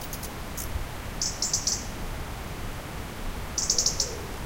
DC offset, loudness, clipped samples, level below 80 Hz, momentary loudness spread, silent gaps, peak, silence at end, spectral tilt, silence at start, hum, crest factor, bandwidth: 0.1%; -29 LUFS; under 0.1%; -38 dBFS; 14 LU; none; -10 dBFS; 0 s; -2 dB/octave; 0 s; none; 22 dB; 17 kHz